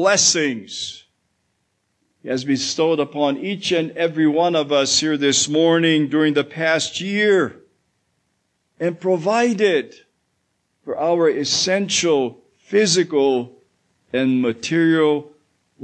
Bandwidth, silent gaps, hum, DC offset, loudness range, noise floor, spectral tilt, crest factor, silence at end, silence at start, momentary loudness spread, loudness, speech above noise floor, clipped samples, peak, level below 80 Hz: 9.4 kHz; none; none; under 0.1%; 6 LU; -70 dBFS; -3.5 dB/octave; 16 dB; 0.55 s; 0 s; 10 LU; -18 LUFS; 52 dB; under 0.1%; -4 dBFS; -68 dBFS